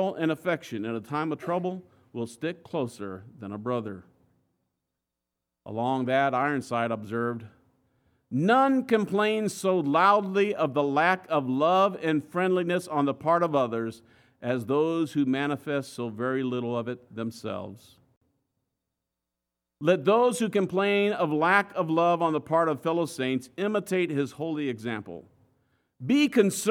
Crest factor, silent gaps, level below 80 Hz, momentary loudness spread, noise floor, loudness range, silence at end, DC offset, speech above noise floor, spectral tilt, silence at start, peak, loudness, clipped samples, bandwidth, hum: 20 dB; 18.17-18.21 s; -76 dBFS; 14 LU; -86 dBFS; 10 LU; 0 s; under 0.1%; 60 dB; -5.5 dB/octave; 0 s; -6 dBFS; -26 LUFS; under 0.1%; 16.5 kHz; none